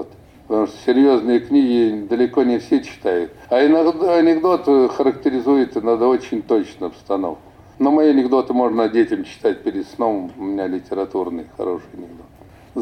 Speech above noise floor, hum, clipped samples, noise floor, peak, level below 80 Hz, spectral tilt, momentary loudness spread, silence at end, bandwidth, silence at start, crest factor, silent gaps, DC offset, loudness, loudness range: 27 dB; none; under 0.1%; -45 dBFS; -6 dBFS; -54 dBFS; -6.5 dB/octave; 11 LU; 0 s; 8.8 kHz; 0 s; 12 dB; none; under 0.1%; -18 LUFS; 6 LU